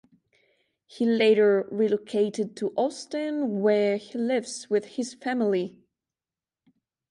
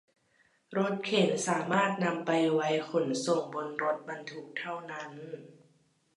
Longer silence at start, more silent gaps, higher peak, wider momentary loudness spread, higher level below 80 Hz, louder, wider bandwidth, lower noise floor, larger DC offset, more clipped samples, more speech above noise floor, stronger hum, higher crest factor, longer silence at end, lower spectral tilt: first, 0.95 s vs 0.7 s; neither; about the same, -10 dBFS vs -12 dBFS; second, 9 LU vs 14 LU; first, -78 dBFS vs -84 dBFS; first, -26 LUFS vs -31 LUFS; about the same, 11 kHz vs 11.5 kHz; first, under -90 dBFS vs -69 dBFS; neither; neither; first, over 65 dB vs 38 dB; neither; about the same, 16 dB vs 20 dB; first, 1.4 s vs 0.65 s; about the same, -5 dB/octave vs -4.5 dB/octave